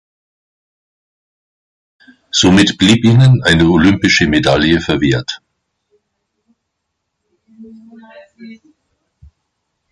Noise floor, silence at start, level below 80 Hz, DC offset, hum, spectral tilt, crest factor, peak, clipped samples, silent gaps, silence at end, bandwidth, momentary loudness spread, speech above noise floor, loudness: -73 dBFS; 2.35 s; -36 dBFS; under 0.1%; none; -5 dB/octave; 16 dB; 0 dBFS; under 0.1%; none; 1.35 s; 11.5 kHz; 8 LU; 63 dB; -11 LUFS